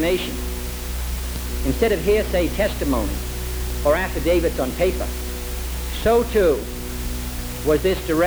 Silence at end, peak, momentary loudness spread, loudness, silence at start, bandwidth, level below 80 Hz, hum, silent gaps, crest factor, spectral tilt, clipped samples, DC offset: 0 s; -6 dBFS; 10 LU; -22 LUFS; 0 s; over 20 kHz; -28 dBFS; none; none; 16 dB; -5 dB/octave; under 0.1%; under 0.1%